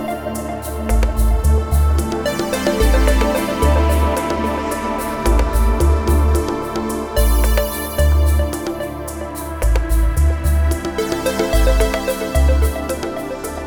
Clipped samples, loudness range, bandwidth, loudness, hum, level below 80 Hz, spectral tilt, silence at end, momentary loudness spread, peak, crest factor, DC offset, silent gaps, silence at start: under 0.1%; 2 LU; over 20 kHz; -18 LUFS; none; -18 dBFS; -6 dB/octave; 0 s; 9 LU; -2 dBFS; 14 dB; under 0.1%; none; 0 s